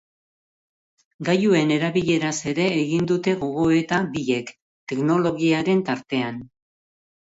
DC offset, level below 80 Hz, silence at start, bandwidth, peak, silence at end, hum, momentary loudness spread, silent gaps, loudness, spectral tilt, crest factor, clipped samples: under 0.1%; -58 dBFS; 1.2 s; 8 kHz; -6 dBFS; 0.9 s; none; 10 LU; 4.62-4.87 s; -22 LUFS; -5.5 dB/octave; 16 dB; under 0.1%